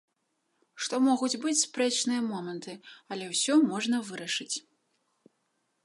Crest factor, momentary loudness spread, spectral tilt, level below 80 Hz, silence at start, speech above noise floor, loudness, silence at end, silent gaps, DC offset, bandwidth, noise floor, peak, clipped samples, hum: 20 dB; 14 LU; -2.5 dB/octave; -84 dBFS; 0.75 s; 48 dB; -28 LUFS; 1.25 s; none; under 0.1%; 11.5 kHz; -77 dBFS; -12 dBFS; under 0.1%; none